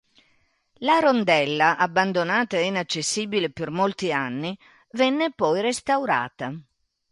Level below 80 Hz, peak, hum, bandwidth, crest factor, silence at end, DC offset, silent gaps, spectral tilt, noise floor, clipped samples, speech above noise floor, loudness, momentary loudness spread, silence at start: -66 dBFS; -6 dBFS; none; 11.5 kHz; 18 dB; 0.5 s; under 0.1%; none; -4 dB/octave; -65 dBFS; under 0.1%; 42 dB; -23 LUFS; 12 LU; 0.8 s